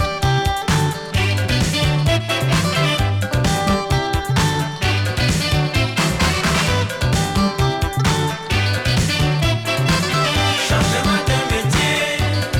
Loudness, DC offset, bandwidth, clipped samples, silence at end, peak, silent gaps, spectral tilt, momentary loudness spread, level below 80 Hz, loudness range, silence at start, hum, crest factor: -18 LUFS; under 0.1%; 19 kHz; under 0.1%; 0 s; -8 dBFS; none; -4.5 dB/octave; 3 LU; -30 dBFS; 1 LU; 0 s; none; 8 dB